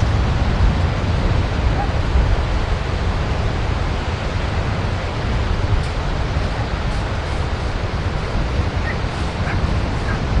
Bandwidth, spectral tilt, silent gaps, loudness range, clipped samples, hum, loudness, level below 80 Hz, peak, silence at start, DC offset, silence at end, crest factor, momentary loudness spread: 10.5 kHz; -6.5 dB/octave; none; 3 LU; under 0.1%; none; -21 LUFS; -22 dBFS; -4 dBFS; 0 s; under 0.1%; 0 s; 14 dB; 4 LU